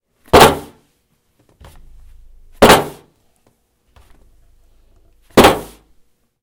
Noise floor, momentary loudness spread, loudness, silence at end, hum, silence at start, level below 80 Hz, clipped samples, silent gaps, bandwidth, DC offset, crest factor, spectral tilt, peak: -62 dBFS; 16 LU; -11 LUFS; 0.8 s; none; 0.35 s; -34 dBFS; 0.4%; none; over 20 kHz; under 0.1%; 16 dB; -4 dB/octave; 0 dBFS